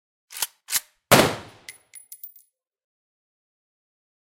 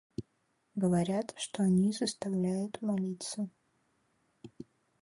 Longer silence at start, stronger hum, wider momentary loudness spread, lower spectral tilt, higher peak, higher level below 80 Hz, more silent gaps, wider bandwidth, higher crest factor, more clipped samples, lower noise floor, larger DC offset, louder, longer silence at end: about the same, 0.3 s vs 0.2 s; neither; first, 25 LU vs 20 LU; second, -3 dB/octave vs -6 dB/octave; first, -2 dBFS vs -18 dBFS; first, -58 dBFS vs -66 dBFS; neither; first, 17 kHz vs 11.5 kHz; first, 26 dB vs 16 dB; neither; second, -58 dBFS vs -76 dBFS; neither; first, -21 LUFS vs -33 LUFS; first, 2.05 s vs 0.4 s